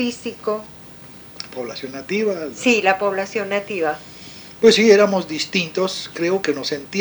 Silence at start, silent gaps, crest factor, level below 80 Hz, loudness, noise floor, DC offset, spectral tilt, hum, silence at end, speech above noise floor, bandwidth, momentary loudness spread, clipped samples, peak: 0 s; none; 18 dB; -60 dBFS; -19 LUFS; -40 dBFS; under 0.1%; -4 dB/octave; none; 0 s; 21 dB; over 20 kHz; 23 LU; under 0.1%; -2 dBFS